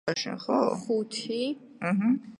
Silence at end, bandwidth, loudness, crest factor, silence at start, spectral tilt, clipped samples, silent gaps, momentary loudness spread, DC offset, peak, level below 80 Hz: 0.05 s; 11.5 kHz; -29 LUFS; 18 dB; 0.05 s; -5 dB/octave; under 0.1%; none; 6 LU; under 0.1%; -10 dBFS; -76 dBFS